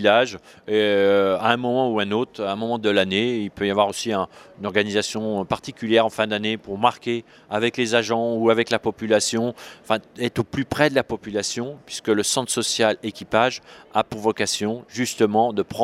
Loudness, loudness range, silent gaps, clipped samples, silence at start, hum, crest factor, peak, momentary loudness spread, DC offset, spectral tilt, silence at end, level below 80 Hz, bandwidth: -22 LUFS; 2 LU; none; under 0.1%; 0 s; none; 22 dB; 0 dBFS; 8 LU; under 0.1%; -4 dB/octave; 0 s; -58 dBFS; 15.5 kHz